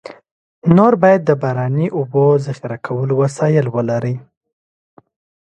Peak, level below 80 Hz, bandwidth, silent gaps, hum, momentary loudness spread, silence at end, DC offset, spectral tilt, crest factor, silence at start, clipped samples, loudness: 0 dBFS; -56 dBFS; 9 kHz; 0.31-0.62 s; none; 12 LU; 1.25 s; under 0.1%; -8.5 dB/octave; 16 dB; 0.05 s; under 0.1%; -15 LUFS